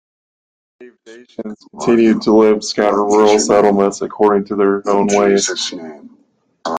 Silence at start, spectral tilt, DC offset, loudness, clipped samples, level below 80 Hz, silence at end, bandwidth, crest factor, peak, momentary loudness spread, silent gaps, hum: 0.8 s; -4.5 dB/octave; under 0.1%; -13 LUFS; under 0.1%; -54 dBFS; 0 s; 9.6 kHz; 14 dB; 0 dBFS; 18 LU; none; none